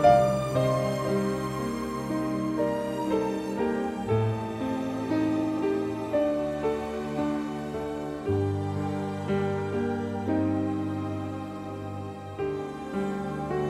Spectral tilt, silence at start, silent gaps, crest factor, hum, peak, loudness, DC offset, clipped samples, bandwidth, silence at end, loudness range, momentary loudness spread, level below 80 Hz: -7.5 dB/octave; 0 s; none; 20 dB; none; -8 dBFS; -29 LUFS; under 0.1%; under 0.1%; 14.5 kHz; 0 s; 3 LU; 7 LU; -52 dBFS